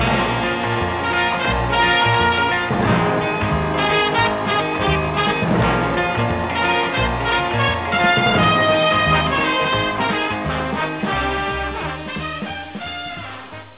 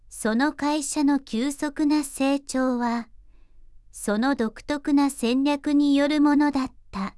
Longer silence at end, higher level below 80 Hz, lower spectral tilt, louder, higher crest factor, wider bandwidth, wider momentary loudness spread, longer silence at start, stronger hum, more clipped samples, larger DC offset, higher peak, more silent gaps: about the same, 0.05 s vs 0.05 s; first, -34 dBFS vs -52 dBFS; first, -9 dB/octave vs -4 dB/octave; first, -18 LUFS vs -24 LUFS; about the same, 14 dB vs 14 dB; second, 4 kHz vs 12 kHz; first, 11 LU vs 8 LU; about the same, 0 s vs 0.1 s; neither; neither; neither; first, -4 dBFS vs -10 dBFS; neither